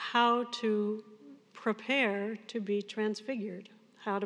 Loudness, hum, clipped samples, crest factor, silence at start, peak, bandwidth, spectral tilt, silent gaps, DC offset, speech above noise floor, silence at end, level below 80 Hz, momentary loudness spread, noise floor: -33 LUFS; none; under 0.1%; 20 dB; 0 s; -14 dBFS; 10 kHz; -5 dB/octave; none; under 0.1%; 21 dB; 0 s; under -90 dBFS; 14 LU; -53 dBFS